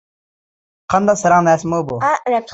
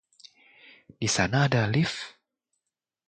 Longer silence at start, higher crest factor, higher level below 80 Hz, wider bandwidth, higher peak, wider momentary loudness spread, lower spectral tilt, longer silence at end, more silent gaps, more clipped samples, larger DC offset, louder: about the same, 0.9 s vs 1 s; second, 16 dB vs 22 dB; about the same, -52 dBFS vs -56 dBFS; second, 8.2 kHz vs 9.4 kHz; first, -2 dBFS vs -8 dBFS; second, 6 LU vs 12 LU; about the same, -5.5 dB/octave vs -4.5 dB/octave; second, 0 s vs 0.95 s; neither; neither; neither; first, -15 LUFS vs -26 LUFS